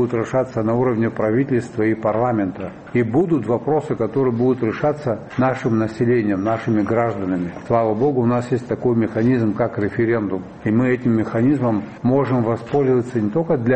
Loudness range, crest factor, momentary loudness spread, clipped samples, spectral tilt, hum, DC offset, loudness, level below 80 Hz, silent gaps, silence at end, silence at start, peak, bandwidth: 1 LU; 16 dB; 4 LU; under 0.1%; -9 dB/octave; none; 0.1%; -19 LUFS; -52 dBFS; none; 0 s; 0 s; -4 dBFS; 8.4 kHz